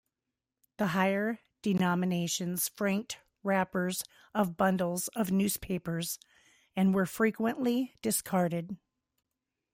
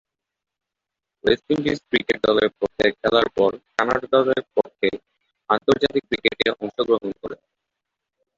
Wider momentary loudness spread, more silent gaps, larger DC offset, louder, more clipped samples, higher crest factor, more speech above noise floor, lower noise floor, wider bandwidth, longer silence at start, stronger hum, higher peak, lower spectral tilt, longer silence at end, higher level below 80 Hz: about the same, 9 LU vs 7 LU; neither; neither; second, -31 LUFS vs -21 LUFS; neither; about the same, 18 dB vs 20 dB; second, 58 dB vs 65 dB; first, -89 dBFS vs -85 dBFS; first, 16.5 kHz vs 7.6 kHz; second, 0.8 s vs 1.25 s; neither; second, -14 dBFS vs -2 dBFS; about the same, -5 dB/octave vs -5.5 dB/octave; about the same, 1 s vs 1.05 s; second, -64 dBFS vs -54 dBFS